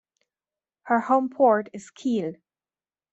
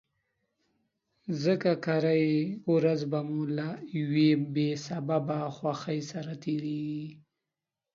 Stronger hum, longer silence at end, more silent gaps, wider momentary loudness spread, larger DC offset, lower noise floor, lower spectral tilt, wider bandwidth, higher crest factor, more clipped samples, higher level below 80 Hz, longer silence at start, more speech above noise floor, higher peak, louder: neither; about the same, 0.8 s vs 0.75 s; neither; about the same, 13 LU vs 11 LU; neither; about the same, under -90 dBFS vs -89 dBFS; about the same, -6.5 dB/octave vs -7 dB/octave; first, 8.2 kHz vs 7.4 kHz; about the same, 18 dB vs 18 dB; neither; about the same, -76 dBFS vs -76 dBFS; second, 0.85 s vs 1.25 s; first, over 67 dB vs 60 dB; first, -8 dBFS vs -12 dBFS; first, -23 LUFS vs -30 LUFS